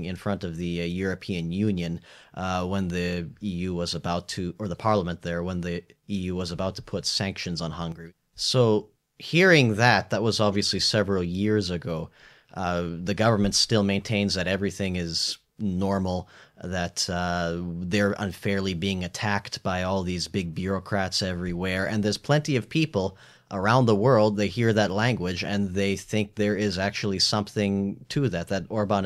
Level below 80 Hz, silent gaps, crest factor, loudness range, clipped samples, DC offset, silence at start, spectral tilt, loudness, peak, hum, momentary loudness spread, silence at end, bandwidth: -52 dBFS; none; 20 dB; 7 LU; under 0.1%; under 0.1%; 0 s; -5 dB/octave; -26 LUFS; -6 dBFS; none; 11 LU; 0 s; 14 kHz